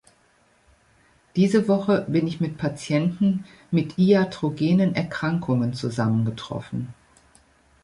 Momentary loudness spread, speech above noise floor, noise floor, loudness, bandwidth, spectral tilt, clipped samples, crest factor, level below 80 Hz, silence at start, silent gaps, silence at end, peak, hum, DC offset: 11 LU; 39 dB; -61 dBFS; -23 LUFS; 11 kHz; -7.5 dB/octave; under 0.1%; 18 dB; -58 dBFS; 1.35 s; none; 0.9 s; -6 dBFS; none; under 0.1%